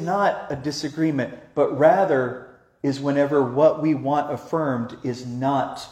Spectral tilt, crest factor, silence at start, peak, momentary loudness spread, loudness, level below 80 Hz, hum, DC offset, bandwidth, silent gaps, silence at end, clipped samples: -6.5 dB/octave; 18 dB; 0 s; -4 dBFS; 11 LU; -22 LUFS; -62 dBFS; none; under 0.1%; 13 kHz; none; 0 s; under 0.1%